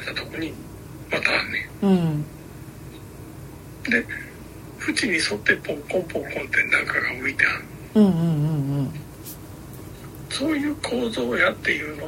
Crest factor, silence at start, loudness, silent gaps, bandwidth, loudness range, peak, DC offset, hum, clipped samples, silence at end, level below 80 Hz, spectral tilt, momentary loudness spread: 22 dB; 0 s; -23 LUFS; none; 16.5 kHz; 5 LU; -2 dBFS; under 0.1%; none; under 0.1%; 0 s; -50 dBFS; -5 dB/octave; 20 LU